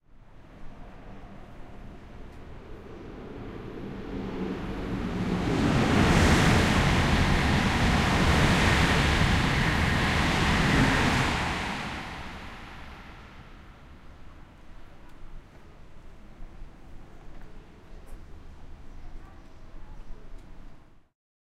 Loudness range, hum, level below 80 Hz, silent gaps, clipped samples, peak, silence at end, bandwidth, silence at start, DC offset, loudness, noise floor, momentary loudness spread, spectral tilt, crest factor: 22 LU; none; -36 dBFS; none; under 0.1%; -8 dBFS; 0.6 s; 15.5 kHz; 0.35 s; under 0.1%; -24 LUFS; -49 dBFS; 25 LU; -5 dB/octave; 20 dB